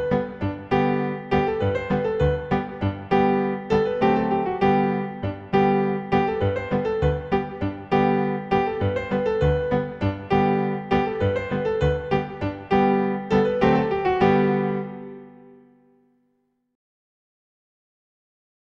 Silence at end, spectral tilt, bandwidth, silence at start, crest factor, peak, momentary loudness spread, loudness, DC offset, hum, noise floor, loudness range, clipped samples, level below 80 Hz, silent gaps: 3.35 s; -8.5 dB/octave; 7.4 kHz; 0 s; 18 dB; -4 dBFS; 8 LU; -23 LUFS; under 0.1%; none; -70 dBFS; 2 LU; under 0.1%; -40 dBFS; none